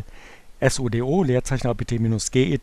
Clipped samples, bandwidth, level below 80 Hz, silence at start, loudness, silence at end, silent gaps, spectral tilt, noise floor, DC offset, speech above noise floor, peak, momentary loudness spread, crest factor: under 0.1%; 13 kHz; -38 dBFS; 0 s; -22 LUFS; 0 s; none; -5.5 dB/octave; -42 dBFS; under 0.1%; 21 dB; -4 dBFS; 4 LU; 18 dB